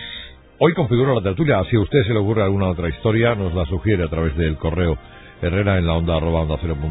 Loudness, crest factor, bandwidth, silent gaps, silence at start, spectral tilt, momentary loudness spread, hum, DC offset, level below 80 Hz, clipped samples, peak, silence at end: -19 LUFS; 18 dB; 4 kHz; none; 0 s; -12.5 dB/octave; 6 LU; none; under 0.1%; -30 dBFS; under 0.1%; -2 dBFS; 0 s